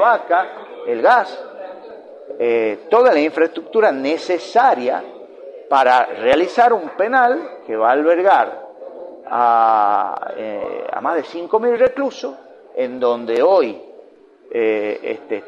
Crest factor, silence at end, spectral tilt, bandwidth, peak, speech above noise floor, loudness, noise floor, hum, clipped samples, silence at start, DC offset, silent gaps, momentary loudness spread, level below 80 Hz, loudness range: 16 dB; 0 s; -4.5 dB/octave; 8.8 kHz; 0 dBFS; 29 dB; -17 LUFS; -45 dBFS; none; under 0.1%; 0 s; under 0.1%; none; 20 LU; -64 dBFS; 4 LU